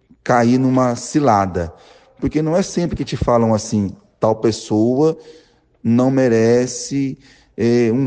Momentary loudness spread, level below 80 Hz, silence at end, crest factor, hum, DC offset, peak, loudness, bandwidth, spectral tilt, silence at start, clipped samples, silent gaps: 11 LU; -42 dBFS; 0 s; 14 dB; none; under 0.1%; -2 dBFS; -17 LUFS; 9.6 kHz; -6.5 dB/octave; 0.25 s; under 0.1%; none